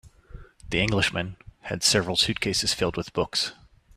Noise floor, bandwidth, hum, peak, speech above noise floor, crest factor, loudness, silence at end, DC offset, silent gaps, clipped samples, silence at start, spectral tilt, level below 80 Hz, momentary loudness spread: -46 dBFS; 15.5 kHz; none; -6 dBFS; 20 dB; 20 dB; -24 LUFS; 0.45 s; under 0.1%; none; under 0.1%; 0.05 s; -3 dB/octave; -46 dBFS; 11 LU